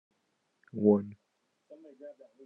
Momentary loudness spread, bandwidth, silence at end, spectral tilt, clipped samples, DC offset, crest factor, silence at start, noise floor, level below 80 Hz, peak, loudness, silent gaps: 24 LU; 2.5 kHz; 0.35 s; -12 dB/octave; under 0.1%; under 0.1%; 22 dB; 0.75 s; -78 dBFS; -86 dBFS; -10 dBFS; -28 LUFS; none